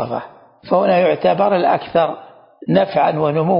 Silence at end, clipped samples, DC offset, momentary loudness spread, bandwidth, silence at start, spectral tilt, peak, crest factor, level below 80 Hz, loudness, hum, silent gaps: 0 s; under 0.1%; under 0.1%; 11 LU; 5.4 kHz; 0 s; -12 dB/octave; -2 dBFS; 14 dB; -58 dBFS; -16 LUFS; none; none